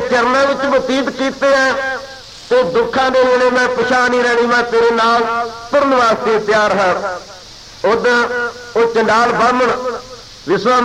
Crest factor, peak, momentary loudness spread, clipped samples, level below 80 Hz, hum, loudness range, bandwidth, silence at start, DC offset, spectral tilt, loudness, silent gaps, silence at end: 10 dB; -2 dBFS; 12 LU; under 0.1%; -48 dBFS; none; 2 LU; 11 kHz; 0 s; 0.1%; -4 dB/octave; -14 LUFS; none; 0 s